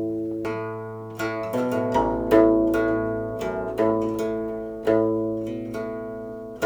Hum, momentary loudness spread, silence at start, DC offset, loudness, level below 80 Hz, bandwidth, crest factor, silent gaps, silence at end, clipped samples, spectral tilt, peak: none; 13 LU; 0 s; under 0.1%; -24 LUFS; -46 dBFS; over 20 kHz; 20 dB; none; 0 s; under 0.1%; -7 dB/octave; -4 dBFS